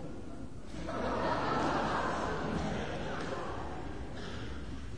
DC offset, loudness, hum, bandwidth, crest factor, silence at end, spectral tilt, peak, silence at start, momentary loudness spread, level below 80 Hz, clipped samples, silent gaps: 0.7%; -36 LUFS; none; 10.5 kHz; 16 dB; 0 s; -5.5 dB/octave; -20 dBFS; 0 s; 13 LU; -48 dBFS; under 0.1%; none